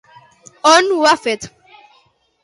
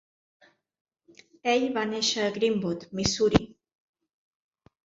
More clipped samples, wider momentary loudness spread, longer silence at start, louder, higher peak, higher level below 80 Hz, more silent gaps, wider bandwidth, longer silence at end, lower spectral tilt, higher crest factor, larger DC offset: neither; first, 14 LU vs 8 LU; second, 0.65 s vs 1.45 s; first, -14 LUFS vs -26 LUFS; about the same, 0 dBFS vs -2 dBFS; second, -62 dBFS vs -50 dBFS; neither; first, 11.5 kHz vs 7.8 kHz; second, 0.95 s vs 1.4 s; second, -1.5 dB/octave vs -4 dB/octave; second, 18 dB vs 28 dB; neither